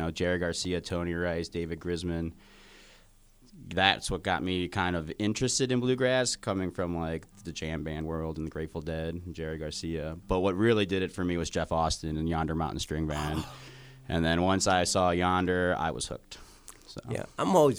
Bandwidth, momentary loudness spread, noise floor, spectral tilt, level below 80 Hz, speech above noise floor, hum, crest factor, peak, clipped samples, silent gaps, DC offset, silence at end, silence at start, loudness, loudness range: over 20 kHz; 12 LU; -58 dBFS; -4.5 dB/octave; -46 dBFS; 29 dB; none; 24 dB; -6 dBFS; under 0.1%; none; under 0.1%; 0 s; 0 s; -30 LUFS; 6 LU